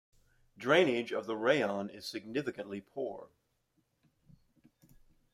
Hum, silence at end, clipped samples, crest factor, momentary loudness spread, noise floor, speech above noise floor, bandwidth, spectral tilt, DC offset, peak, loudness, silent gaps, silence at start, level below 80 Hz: none; 2.05 s; under 0.1%; 22 dB; 15 LU; -77 dBFS; 44 dB; 15.5 kHz; -5 dB/octave; under 0.1%; -14 dBFS; -33 LUFS; none; 0.6 s; -74 dBFS